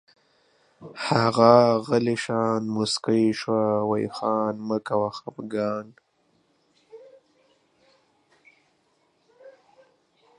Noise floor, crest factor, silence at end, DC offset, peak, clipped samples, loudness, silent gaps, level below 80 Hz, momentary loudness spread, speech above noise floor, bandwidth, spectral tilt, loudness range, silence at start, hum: -67 dBFS; 24 dB; 0.9 s; under 0.1%; -2 dBFS; under 0.1%; -23 LUFS; none; -68 dBFS; 13 LU; 45 dB; 11 kHz; -6 dB/octave; 15 LU; 0.8 s; none